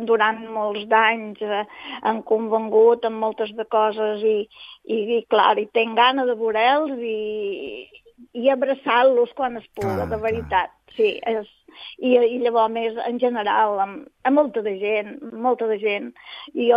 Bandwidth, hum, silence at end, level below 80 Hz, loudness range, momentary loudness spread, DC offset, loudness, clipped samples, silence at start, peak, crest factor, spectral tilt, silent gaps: 5.4 kHz; none; 0 s; -56 dBFS; 2 LU; 11 LU; under 0.1%; -21 LUFS; under 0.1%; 0 s; -2 dBFS; 18 dB; -6.5 dB/octave; none